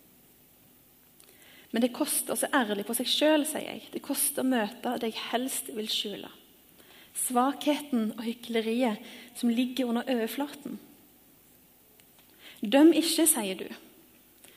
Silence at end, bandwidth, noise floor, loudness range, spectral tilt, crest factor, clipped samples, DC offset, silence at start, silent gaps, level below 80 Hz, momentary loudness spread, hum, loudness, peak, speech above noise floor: 0.8 s; 15.5 kHz; -59 dBFS; 5 LU; -2.5 dB/octave; 20 dB; under 0.1%; under 0.1%; 1.55 s; none; -76 dBFS; 16 LU; none; -28 LUFS; -10 dBFS; 31 dB